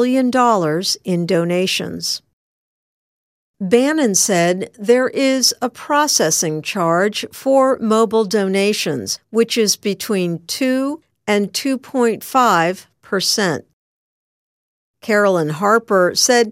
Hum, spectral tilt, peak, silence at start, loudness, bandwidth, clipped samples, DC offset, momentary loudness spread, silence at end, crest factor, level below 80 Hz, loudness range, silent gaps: none; -3.5 dB/octave; 0 dBFS; 0 s; -16 LUFS; 16 kHz; under 0.1%; under 0.1%; 8 LU; 0 s; 16 dB; -66 dBFS; 3 LU; 2.33-3.54 s, 13.73-14.94 s